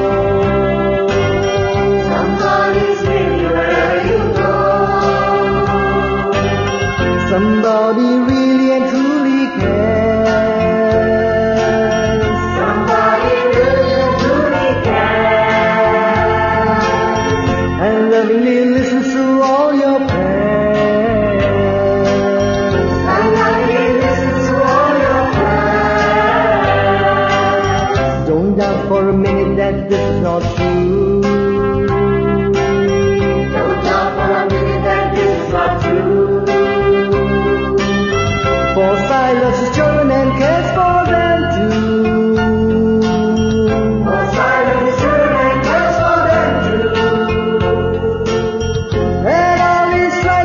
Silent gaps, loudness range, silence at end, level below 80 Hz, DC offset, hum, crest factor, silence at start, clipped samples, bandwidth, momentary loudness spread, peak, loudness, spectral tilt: none; 2 LU; 0 s; -30 dBFS; under 0.1%; none; 12 dB; 0 s; under 0.1%; 7.2 kHz; 3 LU; 0 dBFS; -13 LUFS; -6.5 dB/octave